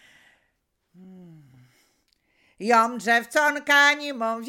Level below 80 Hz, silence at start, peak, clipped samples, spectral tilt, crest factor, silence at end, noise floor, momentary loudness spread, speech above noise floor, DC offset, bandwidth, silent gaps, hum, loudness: -78 dBFS; 1.05 s; -6 dBFS; under 0.1%; -2 dB/octave; 20 dB; 0 s; -74 dBFS; 10 LU; 52 dB; under 0.1%; 18 kHz; none; none; -20 LUFS